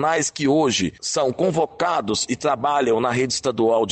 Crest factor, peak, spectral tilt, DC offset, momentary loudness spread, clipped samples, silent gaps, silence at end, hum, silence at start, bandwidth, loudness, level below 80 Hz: 12 dB; -8 dBFS; -4 dB/octave; under 0.1%; 3 LU; under 0.1%; none; 0 s; none; 0 s; 9 kHz; -21 LUFS; -56 dBFS